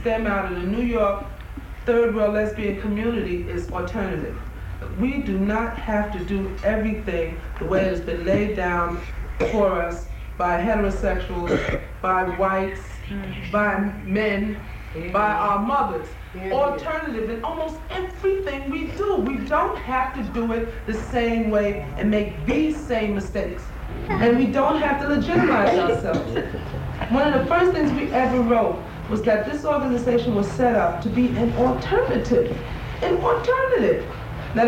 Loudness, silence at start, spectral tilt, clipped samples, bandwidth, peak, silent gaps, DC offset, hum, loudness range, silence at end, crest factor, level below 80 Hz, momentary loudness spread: -23 LUFS; 0 s; -7 dB/octave; under 0.1%; 16 kHz; -8 dBFS; none; under 0.1%; none; 4 LU; 0 s; 14 dB; -34 dBFS; 11 LU